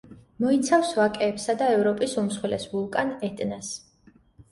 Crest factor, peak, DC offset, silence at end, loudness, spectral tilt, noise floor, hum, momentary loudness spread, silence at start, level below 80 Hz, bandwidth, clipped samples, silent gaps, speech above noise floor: 16 dB; -8 dBFS; under 0.1%; 0.75 s; -25 LUFS; -4.5 dB/octave; -58 dBFS; none; 10 LU; 0.1 s; -62 dBFS; 11.5 kHz; under 0.1%; none; 33 dB